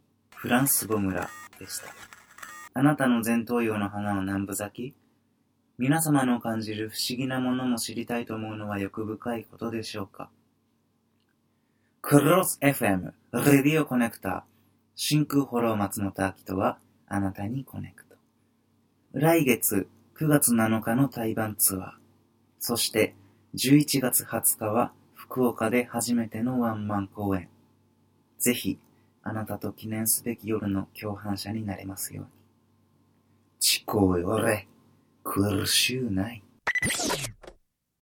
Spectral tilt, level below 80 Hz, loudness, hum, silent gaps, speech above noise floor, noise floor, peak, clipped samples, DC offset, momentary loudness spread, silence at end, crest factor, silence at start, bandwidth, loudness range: -4 dB/octave; -64 dBFS; -26 LUFS; none; none; 44 dB; -70 dBFS; -4 dBFS; under 0.1%; under 0.1%; 15 LU; 0.5 s; 24 dB; 0.35 s; 18 kHz; 7 LU